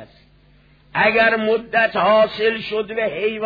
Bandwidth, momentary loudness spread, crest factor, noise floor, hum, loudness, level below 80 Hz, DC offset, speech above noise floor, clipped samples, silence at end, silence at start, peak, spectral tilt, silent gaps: 5 kHz; 9 LU; 16 dB; -52 dBFS; none; -18 LUFS; -54 dBFS; under 0.1%; 34 dB; under 0.1%; 0 s; 0 s; -4 dBFS; -6.5 dB/octave; none